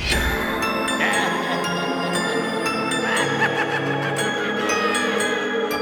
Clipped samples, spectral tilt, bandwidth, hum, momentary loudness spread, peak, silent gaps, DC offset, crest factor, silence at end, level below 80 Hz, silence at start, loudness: under 0.1%; -3.5 dB/octave; 19.5 kHz; none; 3 LU; -6 dBFS; none; under 0.1%; 16 dB; 0 s; -38 dBFS; 0 s; -21 LUFS